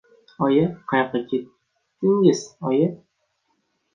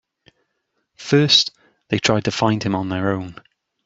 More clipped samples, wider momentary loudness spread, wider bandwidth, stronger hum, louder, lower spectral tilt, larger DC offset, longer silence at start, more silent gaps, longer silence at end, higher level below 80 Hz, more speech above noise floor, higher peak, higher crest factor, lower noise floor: neither; second, 8 LU vs 13 LU; first, 9.2 kHz vs 8 kHz; neither; second, -22 LUFS vs -18 LUFS; first, -6.5 dB/octave vs -4.5 dB/octave; neither; second, 0.4 s vs 1 s; neither; first, 1 s vs 0.55 s; second, -66 dBFS vs -56 dBFS; about the same, 51 dB vs 54 dB; about the same, -4 dBFS vs -2 dBFS; about the same, 20 dB vs 20 dB; about the same, -71 dBFS vs -73 dBFS